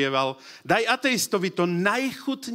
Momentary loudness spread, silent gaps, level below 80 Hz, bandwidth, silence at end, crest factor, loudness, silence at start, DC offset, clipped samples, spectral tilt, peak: 7 LU; none; -70 dBFS; 16 kHz; 0 s; 20 dB; -24 LUFS; 0 s; under 0.1%; under 0.1%; -4 dB/octave; -6 dBFS